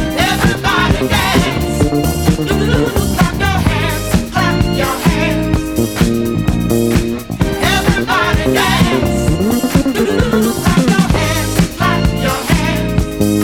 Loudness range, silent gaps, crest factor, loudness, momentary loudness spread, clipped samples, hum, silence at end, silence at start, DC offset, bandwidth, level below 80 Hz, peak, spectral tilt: 2 LU; none; 12 dB; -14 LUFS; 4 LU; under 0.1%; none; 0 s; 0 s; 0.7%; 19 kHz; -24 dBFS; 0 dBFS; -5 dB/octave